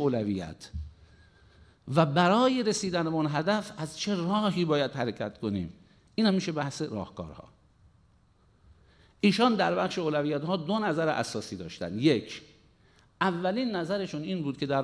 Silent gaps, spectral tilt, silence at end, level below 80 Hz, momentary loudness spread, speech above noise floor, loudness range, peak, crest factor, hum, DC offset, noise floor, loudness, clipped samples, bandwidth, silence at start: none; -5.5 dB/octave; 0 s; -56 dBFS; 16 LU; 35 dB; 6 LU; -10 dBFS; 20 dB; none; under 0.1%; -63 dBFS; -28 LUFS; under 0.1%; 11 kHz; 0 s